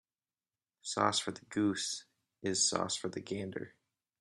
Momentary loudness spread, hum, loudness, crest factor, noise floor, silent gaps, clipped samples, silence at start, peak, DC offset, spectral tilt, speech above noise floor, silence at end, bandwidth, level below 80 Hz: 13 LU; none; -34 LUFS; 24 dB; under -90 dBFS; none; under 0.1%; 0.85 s; -12 dBFS; under 0.1%; -2.5 dB/octave; over 55 dB; 0.55 s; 12.5 kHz; -76 dBFS